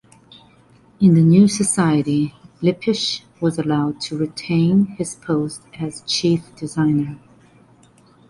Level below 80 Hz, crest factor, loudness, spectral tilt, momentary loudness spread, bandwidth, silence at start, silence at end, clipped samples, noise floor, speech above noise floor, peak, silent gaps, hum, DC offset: -54 dBFS; 16 dB; -19 LUFS; -5.5 dB/octave; 14 LU; 11.5 kHz; 1 s; 1.1 s; under 0.1%; -51 dBFS; 34 dB; -2 dBFS; none; none; under 0.1%